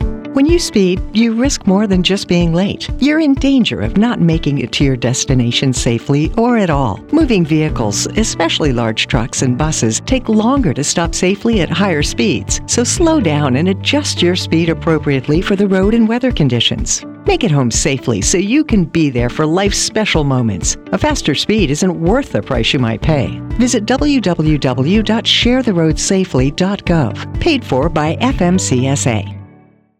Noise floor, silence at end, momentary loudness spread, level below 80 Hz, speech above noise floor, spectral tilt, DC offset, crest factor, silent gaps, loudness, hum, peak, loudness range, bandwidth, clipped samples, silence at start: -45 dBFS; 0.55 s; 4 LU; -26 dBFS; 32 dB; -4.5 dB/octave; under 0.1%; 12 dB; none; -14 LUFS; none; 0 dBFS; 1 LU; 14.5 kHz; under 0.1%; 0 s